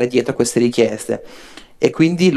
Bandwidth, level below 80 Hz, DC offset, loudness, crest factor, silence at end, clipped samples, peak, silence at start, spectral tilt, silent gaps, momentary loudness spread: 13 kHz; -54 dBFS; under 0.1%; -17 LUFS; 16 dB; 0 s; under 0.1%; 0 dBFS; 0 s; -5.5 dB/octave; none; 10 LU